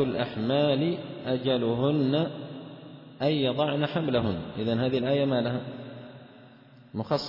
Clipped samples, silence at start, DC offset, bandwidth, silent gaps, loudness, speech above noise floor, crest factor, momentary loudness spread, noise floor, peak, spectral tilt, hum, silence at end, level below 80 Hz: under 0.1%; 0 s; under 0.1%; 5.8 kHz; none; -27 LUFS; 26 dB; 16 dB; 17 LU; -52 dBFS; -12 dBFS; -8 dB/octave; none; 0 s; -62 dBFS